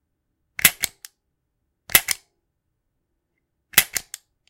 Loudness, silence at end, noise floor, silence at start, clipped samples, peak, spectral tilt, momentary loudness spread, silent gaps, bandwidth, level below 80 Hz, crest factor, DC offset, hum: -20 LUFS; 0.5 s; -76 dBFS; 0.65 s; under 0.1%; 0 dBFS; 0.5 dB/octave; 12 LU; none; 17 kHz; -54 dBFS; 26 dB; under 0.1%; none